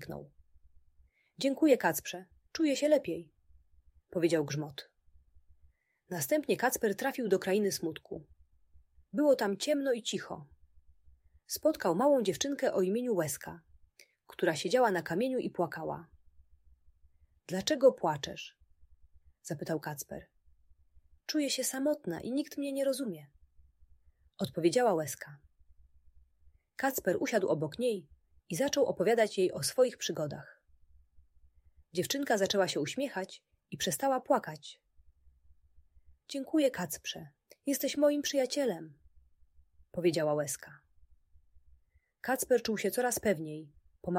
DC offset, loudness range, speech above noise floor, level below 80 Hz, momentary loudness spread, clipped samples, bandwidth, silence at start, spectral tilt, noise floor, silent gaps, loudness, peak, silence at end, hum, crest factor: under 0.1%; 5 LU; 37 dB; -68 dBFS; 17 LU; under 0.1%; 16 kHz; 0 s; -4 dB/octave; -69 dBFS; none; -32 LUFS; -12 dBFS; 0 s; none; 22 dB